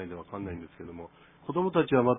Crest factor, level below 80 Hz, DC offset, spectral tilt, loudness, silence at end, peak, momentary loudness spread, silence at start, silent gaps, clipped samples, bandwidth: 20 dB; -60 dBFS; under 0.1%; -11 dB/octave; -30 LUFS; 0 s; -10 dBFS; 20 LU; 0 s; none; under 0.1%; 3.9 kHz